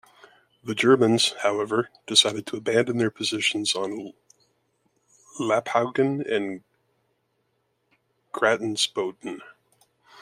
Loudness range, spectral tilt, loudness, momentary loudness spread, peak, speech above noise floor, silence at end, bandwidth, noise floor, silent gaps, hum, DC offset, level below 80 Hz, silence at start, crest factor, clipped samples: 7 LU; -3.5 dB/octave; -23 LUFS; 18 LU; -2 dBFS; 49 dB; 0.75 s; 16 kHz; -73 dBFS; none; none; under 0.1%; -72 dBFS; 0.65 s; 24 dB; under 0.1%